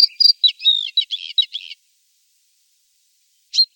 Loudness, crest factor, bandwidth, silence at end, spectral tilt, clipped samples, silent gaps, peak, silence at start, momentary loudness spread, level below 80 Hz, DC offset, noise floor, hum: -15 LUFS; 18 dB; 17 kHz; 0.1 s; 11.5 dB/octave; under 0.1%; none; -2 dBFS; 0 s; 13 LU; under -90 dBFS; under 0.1%; -62 dBFS; none